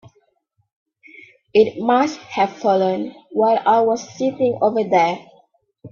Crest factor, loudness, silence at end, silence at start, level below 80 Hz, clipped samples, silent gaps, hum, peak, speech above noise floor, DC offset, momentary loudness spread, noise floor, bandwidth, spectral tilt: 18 dB; -18 LUFS; 0.05 s; 1.55 s; -66 dBFS; under 0.1%; none; none; -2 dBFS; 49 dB; under 0.1%; 6 LU; -66 dBFS; 7.2 kHz; -5.5 dB/octave